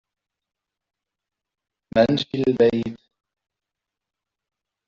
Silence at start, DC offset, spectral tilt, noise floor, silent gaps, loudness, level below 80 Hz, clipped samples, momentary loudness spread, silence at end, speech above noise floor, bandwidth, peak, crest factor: 1.95 s; under 0.1%; -5 dB/octave; -86 dBFS; none; -20 LUFS; -58 dBFS; under 0.1%; 9 LU; 1.9 s; 67 dB; 7.4 kHz; -4 dBFS; 22 dB